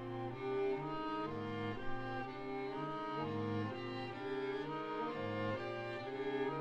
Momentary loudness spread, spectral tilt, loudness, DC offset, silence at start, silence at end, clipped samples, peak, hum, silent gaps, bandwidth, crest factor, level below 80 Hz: 4 LU; -7.5 dB/octave; -42 LUFS; under 0.1%; 0 s; 0 s; under 0.1%; -28 dBFS; none; none; 8.6 kHz; 12 dB; -60 dBFS